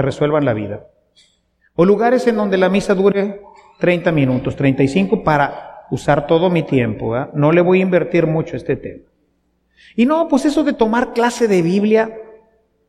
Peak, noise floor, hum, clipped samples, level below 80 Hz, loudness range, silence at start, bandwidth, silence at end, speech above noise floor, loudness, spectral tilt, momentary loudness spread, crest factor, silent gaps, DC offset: -2 dBFS; -63 dBFS; none; under 0.1%; -46 dBFS; 2 LU; 0 s; 12 kHz; 0.55 s; 48 dB; -16 LUFS; -7 dB/octave; 11 LU; 16 dB; none; under 0.1%